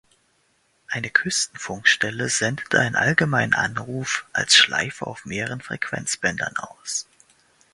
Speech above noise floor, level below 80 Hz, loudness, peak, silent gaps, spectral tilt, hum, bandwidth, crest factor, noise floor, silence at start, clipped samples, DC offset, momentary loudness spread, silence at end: 42 dB; -58 dBFS; -21 LUFS; 0 dBFS; none; -2 dB/octave; none; 11.5 kHz; 24 dB; -65 dBFS; 0.9 s; under 0.1%; under 0.1%; 13 LU; 0.7 s